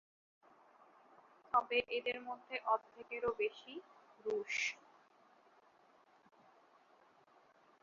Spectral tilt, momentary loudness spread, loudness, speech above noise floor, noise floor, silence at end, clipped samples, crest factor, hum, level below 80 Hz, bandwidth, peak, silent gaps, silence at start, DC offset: 0.5 dB/octave; 15 LU; -39 LUFS; 29 dB; -69 dBFS; 3.1 s; under 0.1%; 24 dB; none; -80 dBFS; 7.2 kHz; -20 dBFS; none; 1.55 s; under 0.1%